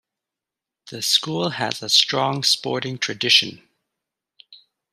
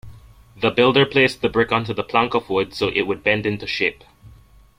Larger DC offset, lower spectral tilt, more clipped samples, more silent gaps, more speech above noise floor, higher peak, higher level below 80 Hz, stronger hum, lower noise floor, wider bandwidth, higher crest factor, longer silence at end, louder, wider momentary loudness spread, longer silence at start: neither; second, -2 dB/octave vs -6 dB/octave; neither; neither; first, 66 dB vs 29 dB; about the same, -2 dBFS vs -2 dBFS; second, -70 dBFS vs -50 dBFS; neither; first, -87 dBFS vs -48 dBFS; first, 15.5 kHz vs 14 kHz; about the same, 22 dB vs 18 dB; second, 0.35 s vs 0.5 s; about the same, -19 LUFS vs -19 LUFS; first, 10 LU vs 7 LU; first, 0.85 s vs 0.05 s